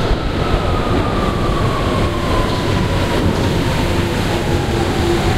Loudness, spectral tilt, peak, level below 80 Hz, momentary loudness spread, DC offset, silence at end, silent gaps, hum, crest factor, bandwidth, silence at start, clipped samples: -17 LUFS; -6 dB/octave; -2 dBFS; -22 dBFS; 1 LU; under 0.1%; 0 s; none; none; 14 dB; 16 kHz; 0 s; under 0.1%